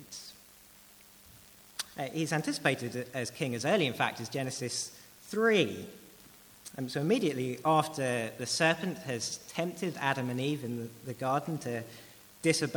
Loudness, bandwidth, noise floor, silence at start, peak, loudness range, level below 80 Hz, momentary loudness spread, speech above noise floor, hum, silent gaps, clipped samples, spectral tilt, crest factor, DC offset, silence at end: -32 LUFS; over 20 kHz; -57 dBFS; 0 s; -10 dBFS; 4 LU; -72 dBFS; 17 LU; 25 dB; none; none; under 0.1%; -4 dB/octave; 22 dB; under 0.1%; 0 s